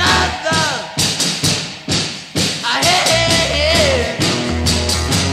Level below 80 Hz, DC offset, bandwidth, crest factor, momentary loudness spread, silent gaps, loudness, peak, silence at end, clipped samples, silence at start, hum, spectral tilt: -30 dBFS; under 0.1%; 16 kHz; 14 dB; 6 LU; none; -15 LUFS; 0 dBFS; 0 s; under 0.1%; 0 s; none; -3 dB/octave